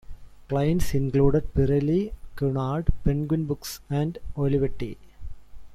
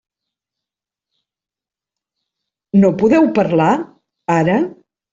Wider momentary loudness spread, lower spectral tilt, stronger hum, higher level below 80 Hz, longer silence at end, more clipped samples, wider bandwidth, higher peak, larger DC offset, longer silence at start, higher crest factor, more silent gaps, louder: about the same, 13 LU vs 11 LU; about the same, -7.5 dB/octave vs -8 dB/octave; neither; first, -34 dBFS vs -56 dBFS; second, 0 s vs 0.4 s; neither; first, 15.5 kHz vs 7.8 kHz; about the same, -4 dBFS vs -2 dBFS; neither; second, 0.1 s vs 2.75 s; about the same, 20 dB vs 16 dB; neither; second, -26 LUFS vs -15 LUFS